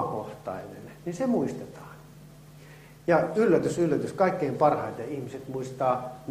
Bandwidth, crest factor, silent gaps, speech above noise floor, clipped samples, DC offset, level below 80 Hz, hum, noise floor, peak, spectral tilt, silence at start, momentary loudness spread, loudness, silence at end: 15.5 kHz; 20 dB; none; 23 dB; under 0.1%; under 0.1%; -62 dBFS; none; -49 dBFS; -8 dBFS; -7 dB/octave; 0 s; 16 LU; -27 LUFS; 0 s